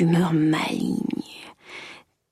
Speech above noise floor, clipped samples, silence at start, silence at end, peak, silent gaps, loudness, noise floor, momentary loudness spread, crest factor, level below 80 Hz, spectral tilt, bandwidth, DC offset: 24 dB; under 0.1%; 0 s; 0.35 s; -10 dBFS; none; -23 LUFS; -46 dBFS; 20 LU; 14 dB; -62 dBFS; -6.5 dB/octave; 14 kHz; under 0.1%